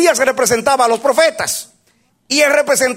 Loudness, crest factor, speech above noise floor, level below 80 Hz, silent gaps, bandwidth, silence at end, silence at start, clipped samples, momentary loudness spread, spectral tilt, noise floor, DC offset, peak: -13 LUFS; 14 dB; 45 dB; -54 dBFS; none; 16.5 kHz; 0 s; 0 s; under 0.1%; 8 LU; -1.5 dB/octave; -58 dBFS; under 0.1%; 0 dBFS